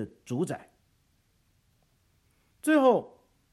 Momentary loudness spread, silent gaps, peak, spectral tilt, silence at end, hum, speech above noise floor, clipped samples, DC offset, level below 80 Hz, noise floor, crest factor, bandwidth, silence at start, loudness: 13 LU; none; -10 dBFS; -6 dB/octave; 0.45 s; none; 43 dB; under 0.1%; under 0.1%; -72 dBFS; -69 dBFS; 20 dB; 13 kHz; 0 s; -27 LUFS